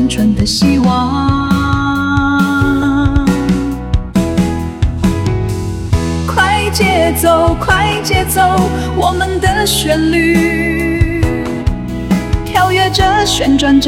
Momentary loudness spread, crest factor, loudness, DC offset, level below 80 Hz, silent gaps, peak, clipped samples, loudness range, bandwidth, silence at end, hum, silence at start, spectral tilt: 6 LU; 12 dB; -13 LUFS; 0.2%; -22 dBFS; none; 0 dBFS; under 0.1%; 3 LU; 17 kHz; 0 s; none; 0 s; -5 dB/octave